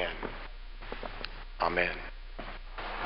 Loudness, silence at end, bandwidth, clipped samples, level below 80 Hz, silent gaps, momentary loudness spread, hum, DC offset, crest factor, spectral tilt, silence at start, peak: -36 LUFS; 0 s; 5.6 kHz; under 0.1%; -44 dBFS; none; 16 LU; none; 0.1%; 24 dB; -7.5 dB/octave; 0 s; -12 dBFS